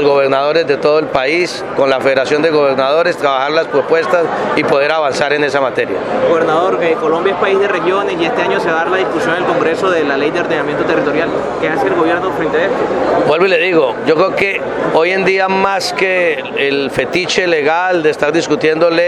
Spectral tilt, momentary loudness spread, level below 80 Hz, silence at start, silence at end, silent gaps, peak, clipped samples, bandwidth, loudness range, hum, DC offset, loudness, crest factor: -4.5 dB/octave; 3 LU; -48 dBFS; 0 s; 0 s; none; 0 dBFS; under 0.1%; 12.5 kHz; 2 LU; none; under 0.1%; -13 LUFS; 12 dB